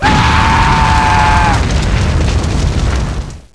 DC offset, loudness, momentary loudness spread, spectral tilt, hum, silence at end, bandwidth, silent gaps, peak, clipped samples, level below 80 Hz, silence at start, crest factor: 0.9%; -11 LUFS; 7 LU; -5 dB/octave; none; 0.15 s; 11 kHz; none; 0 dBFS; under 0.1%; -16 dBFS; 0 s; 10 dB